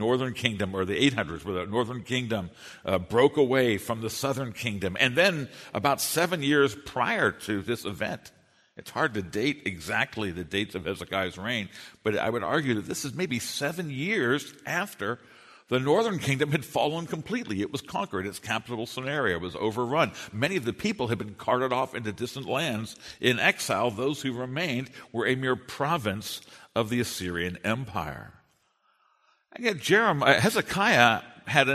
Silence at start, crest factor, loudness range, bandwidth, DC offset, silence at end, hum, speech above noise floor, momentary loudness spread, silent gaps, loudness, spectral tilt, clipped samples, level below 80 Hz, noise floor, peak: 0 s; 26 dB; 5 LU; 13.5 kHz; under 0.1%; 0 s; none; 41 dB; 11 LU; none; -27 LUFS; -4.5 dB/octave; under 0.1%; -60 dBFS; -69 dBFS; -2 dBFS